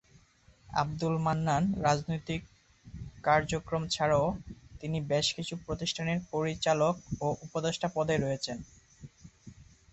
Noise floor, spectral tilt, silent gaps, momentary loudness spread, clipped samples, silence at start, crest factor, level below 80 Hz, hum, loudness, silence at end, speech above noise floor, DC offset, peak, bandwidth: -62 dBFS; -5 dB/octave; none; 10 LU; under 0.1%; 0.7 s; 20 dB; -54 dBFS; none; -31 LUFS; 0.3 s; 32 dB; under 0.1%; -12 dBFS; 8.4 kHz